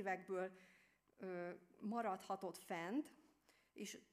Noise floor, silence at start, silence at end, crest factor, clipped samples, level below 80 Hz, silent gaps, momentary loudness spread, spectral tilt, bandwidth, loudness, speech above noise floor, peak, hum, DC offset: -76 dBFS; 0 s; 0.1 s; 18 dB; under 0.1%; under -90 dBFS; none; 11 LU; -5 dB/octave; 15.5 kHz; -48 LUFS; 29 dB; -32 dBFS; none; under 0.1%